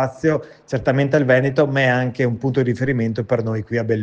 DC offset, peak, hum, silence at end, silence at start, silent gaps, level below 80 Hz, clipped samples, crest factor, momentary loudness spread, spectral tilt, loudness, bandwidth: under 0.1%; -2 dBFS; none; 0 s; 0 s; none; -52 dBFS; under 0.1%; 16 dB; 7 LU; -7.5 dB/octave; -19 LUFS; 7.8 kHz